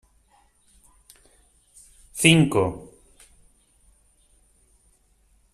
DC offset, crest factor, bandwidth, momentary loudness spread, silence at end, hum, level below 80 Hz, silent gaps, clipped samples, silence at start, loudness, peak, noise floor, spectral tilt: under 0.1%; 28 dB; 14.5 kHz; 23 LU; 2.75 s; none; -56 dBFS; none; under 0.1%; 2.15 s; -19 LUFS; 0 dBFS; -62 dBFS; -4.5 dB/octave